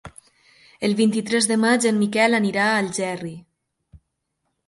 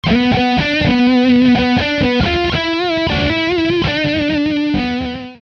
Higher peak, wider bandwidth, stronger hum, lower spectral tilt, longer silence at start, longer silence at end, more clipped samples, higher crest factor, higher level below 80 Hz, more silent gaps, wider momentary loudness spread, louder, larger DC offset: about the same, -4 dBFS vs -2 dBFS; first, 11.5 kHz vs 6.8 kHz; neither; second, -4 dB/octave vs -6.5 dB/octave; about the same, 0.05 s vs 0.05 s; first, 1.25 s vs 0.05 s; neither; first, 18 dB vs 12 dB; second, -62 dBFS vs -32 dBFS; neither; first, 9 LU vs 6 LU; second, -20 LUFS vs -14 LUFS; neither